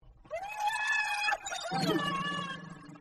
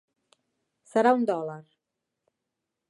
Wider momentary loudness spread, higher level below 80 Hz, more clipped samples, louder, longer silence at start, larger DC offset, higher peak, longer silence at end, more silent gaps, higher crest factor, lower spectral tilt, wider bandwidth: second, 13 LU vs 16 LU; first, -64 dBFS vs -84 dBFS; neither; second, -32 LUFS vs -25 LUFS; second, 0.05 s vs 0.95 s; neither; second, -18 dBFS vs -8 dBFS; second, 0 s vs 1.3 s; neither; second, 16 dB vs 22 dB; second, -3.5 dB/octave vs -6 dB/octave; first, 13.5 kHz vs 11 kHz